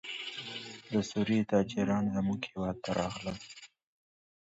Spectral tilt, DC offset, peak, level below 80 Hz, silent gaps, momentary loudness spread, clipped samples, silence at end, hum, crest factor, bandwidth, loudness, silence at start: -6 dB/octave; under 0.1%; -14 dBFS; -60 dBFS; none; 13 LU; under 0.1%; 0.75 s; none; 20 dB; 8 kHz; -33 LUFS; 0.05 s